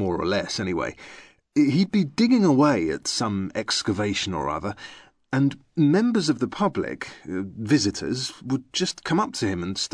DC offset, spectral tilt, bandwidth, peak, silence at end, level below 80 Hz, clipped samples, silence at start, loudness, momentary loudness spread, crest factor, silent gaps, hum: under 0.1%; -5 dB/octave; 11 kHz; -8 dBFS; 0.05 s; -54 dBFS; under 0.1%; 0 s; -24 LUFS; 12 LU; 16 dB; none; none